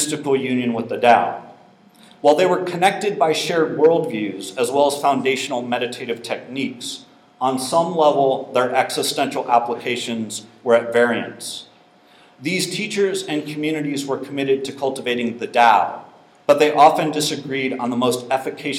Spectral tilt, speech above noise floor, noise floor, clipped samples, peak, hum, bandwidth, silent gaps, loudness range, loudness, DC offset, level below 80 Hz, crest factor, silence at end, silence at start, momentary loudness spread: -4 dB/octave; 32 dB; -51 dBFS; under 0.1%; 0 dBFS; none; 16.5 kHz; none; 5 LU; -19 LUFS; under 0.1%; -72 dBFS; 20 dB; 0 s; 0 s; 12 LU